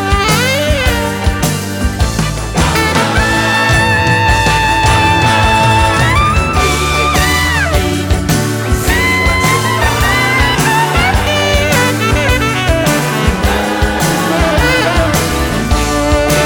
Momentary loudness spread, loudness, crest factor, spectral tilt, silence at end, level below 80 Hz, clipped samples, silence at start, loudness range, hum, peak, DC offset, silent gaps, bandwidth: 5 LU; -11 LUFS; 12 dB; -4 dB/octave; 0 s; -20 dBFS; under 0.1%; 0 s; 3 LU; none; 0 dBFS; under 0.1%; none; over 20 kHz